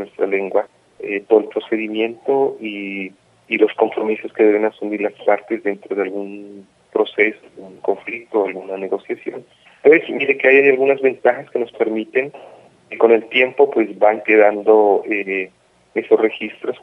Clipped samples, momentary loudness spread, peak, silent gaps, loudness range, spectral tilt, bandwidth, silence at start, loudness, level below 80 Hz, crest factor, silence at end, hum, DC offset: under 0.1%; 14 LU; 0 dBFS; none; 7 LU; -6.5 dB/octave; 3.9 kHz; 0 s; -17 LUFS; -72 dBFS; 18 dB; 0.05 s; none; under 0.1%